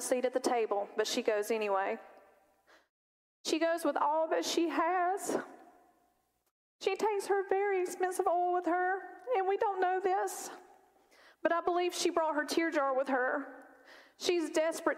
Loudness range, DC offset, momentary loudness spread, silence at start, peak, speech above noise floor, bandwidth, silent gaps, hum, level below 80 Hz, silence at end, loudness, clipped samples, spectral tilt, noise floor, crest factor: 3 LU; under 0.1%; 7 LU; 0 s; -16 dBFS; 43 dB; 16 kHz; 2.89-3.44 s, 6.51-6.79 s; none; -80 dBFS; 0 s; -32 LUFS; under 0.1%; -2 dB/octave; -75 dBFS; 18 dB